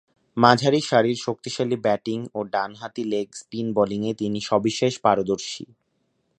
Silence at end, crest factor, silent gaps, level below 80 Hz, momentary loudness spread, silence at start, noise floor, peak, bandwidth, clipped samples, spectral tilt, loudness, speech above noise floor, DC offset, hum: 0.75 s; 24 dB; none; -62 dBFS; 12 LU; 0.35 s; -71 dBFS; 0 dBFS; 10.5 kHz; under 0.1%; -5 dB/octave; -23 LUFS; 48 dB; under 0.1%; none